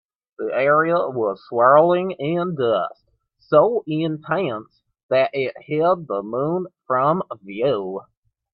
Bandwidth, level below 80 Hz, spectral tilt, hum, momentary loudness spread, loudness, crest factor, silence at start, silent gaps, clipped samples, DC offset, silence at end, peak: 5.4 kHz; -66 dBFS; -11 dB/octave; none; 11 LU; -20 LUFS; 20 dB; 0.4 s; 5.03-5.09 s; under 0.1%; under 0.1%; 0.55 s; -2 dBFS